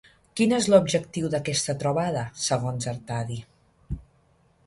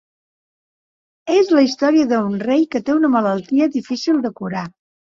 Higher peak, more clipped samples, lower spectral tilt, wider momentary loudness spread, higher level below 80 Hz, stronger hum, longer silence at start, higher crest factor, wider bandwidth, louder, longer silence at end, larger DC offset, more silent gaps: second, -6 dBFS vs -2 dBFS; neither; about the same, -5 dB/octave vs -6 dB/octave; first, 19 LU vs 11 LU; first, -50 dBFS vs -62 dBFS; neither; second, 0.35 s vs 1.25 s; first, 22 dB vs 16 dB; first, 11.5 kHz vs 7.4 kHz; second, -25 LUFS vs -17 LUFS; first, 0.65 s vs 0.35 s; neither; neither